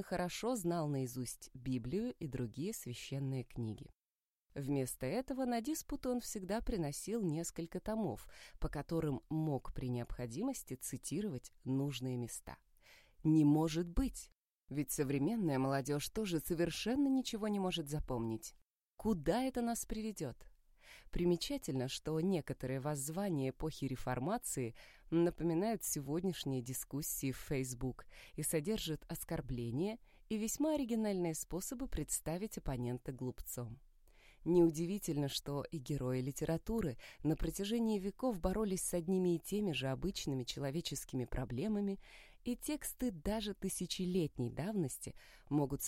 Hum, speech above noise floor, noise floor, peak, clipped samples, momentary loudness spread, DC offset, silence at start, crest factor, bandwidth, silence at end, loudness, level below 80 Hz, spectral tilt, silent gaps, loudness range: none; over 52 dB; under -90 dBFS; -20 dBFS; under 0.1%; 9 LU; under 0.1%; 0 s; 20 dB; 16.5 kHz; 0 s; -39 LUFS; -54 dBFS; -5.5 dB/octave; 4.15-4.19 s, 4.28-4.32 s, 14.35-14.42 s, 14.55-14.59 s, 18.73-18.91 s; 4 LU